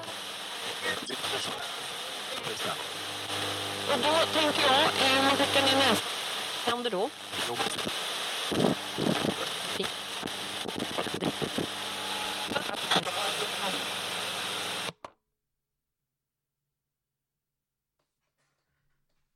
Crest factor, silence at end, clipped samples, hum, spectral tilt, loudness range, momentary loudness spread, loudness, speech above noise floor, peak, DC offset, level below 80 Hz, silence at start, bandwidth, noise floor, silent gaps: 22 dB; 4.3 s; under 0.1%; none; -2.5 dB/octave; 9 LU; 11 LU; -29 LUFS; 60 dB; -10 dBFS; under 0.1%; -68 dBFS; 0 s; 16.5 kHz; -87 dBFS; none